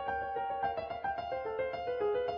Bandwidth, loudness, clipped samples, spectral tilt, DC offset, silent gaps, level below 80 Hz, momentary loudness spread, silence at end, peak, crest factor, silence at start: 6.2 kHz; -36 LUFS; under 0.1%; -2.5 dB/octave; under 0.1%; none; -60 dBFS; 4 LU; 0 s; -22 dBFS; 14 dB; 0 s